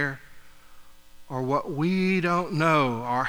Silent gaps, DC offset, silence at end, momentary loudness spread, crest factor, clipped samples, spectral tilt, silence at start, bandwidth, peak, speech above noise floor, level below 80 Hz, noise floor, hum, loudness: none; under 0.1%; 0 s; 11 LU; 20 dB; under 0.1%; -6.5 dB/octave; 0 s; 18.5 kHz; -8 dBFS; 22 dB; -56 dBFS; -46 dBFS; none; -25 LUFS